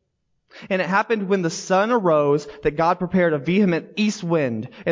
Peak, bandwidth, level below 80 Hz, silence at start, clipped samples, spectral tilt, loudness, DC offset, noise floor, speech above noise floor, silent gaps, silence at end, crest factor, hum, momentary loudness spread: -6 dBFS; 7.6 kHz; -52 dBFS; 0.55 s; under 0.1%; -6 dB/octave; -21 LUFS; under 0.1%; -71 dBFS; 51 dB; none; 0 s; 14 dB; none; 6 LU